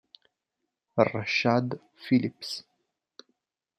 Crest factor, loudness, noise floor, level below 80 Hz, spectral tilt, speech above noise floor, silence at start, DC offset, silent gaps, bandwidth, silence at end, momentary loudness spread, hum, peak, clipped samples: 24 dB; -27 LUFS; -84 dBFS; -74 dBFS; -6 dB/octave; 57 dB; 0.95 s; under 0.1%; none; 13.5 kHz; 1.15 s; 13 LU; none; -6 dBFS; under 0.1%